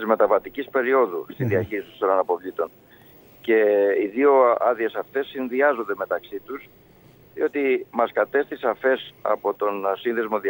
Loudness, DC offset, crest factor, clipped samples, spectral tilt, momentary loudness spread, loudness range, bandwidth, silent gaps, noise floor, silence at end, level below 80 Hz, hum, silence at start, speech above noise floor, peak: -22 LUFS; under 0.1%; 18 dB; under 0.1%; -8 dB/octave; 11 LU; 4 LU; 16.5 kHz; none; -52 dBFS; 0 s; -64 dBFS; none; 0 s; 30 dB; -4 dBFS